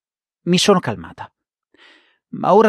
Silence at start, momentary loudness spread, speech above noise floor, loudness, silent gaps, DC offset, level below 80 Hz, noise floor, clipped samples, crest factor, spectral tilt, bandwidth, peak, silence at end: 0.45 s; 23 LU; 40 dB; -17 LUFS; none; under 0.1%; -58 dBFS; -56 dBFS; under 0.1%; 16 dB; -5 dB/octave; 14 kHz; -2 dBFS; 0 s